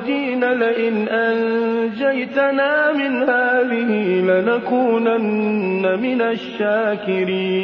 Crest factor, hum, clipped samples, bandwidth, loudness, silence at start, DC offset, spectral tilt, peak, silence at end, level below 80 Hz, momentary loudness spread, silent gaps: 14 dB; none; under 0.1%; 6 kHz; -18 LUFS; 0 s; under 0.1%; -8 dB/octave; -4 dBFS; 0 s; -64 dBFS; 4 LU; none